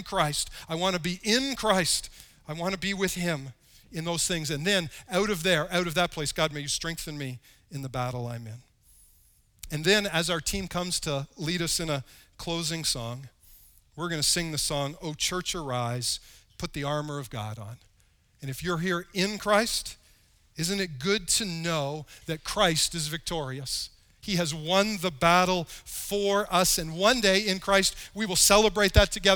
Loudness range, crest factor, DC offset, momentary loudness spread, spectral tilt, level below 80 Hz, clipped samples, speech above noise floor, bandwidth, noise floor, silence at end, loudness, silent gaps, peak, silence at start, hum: 8 LU; 24 dB; under 0.1%; 15 LU; -3 dB/octave; -46 dBFS; under 0.1%; 36 dB; over 20 kHz; -64 dBFS; 0 s; -27 LUFS; none; -4 dBFS; 0 s; none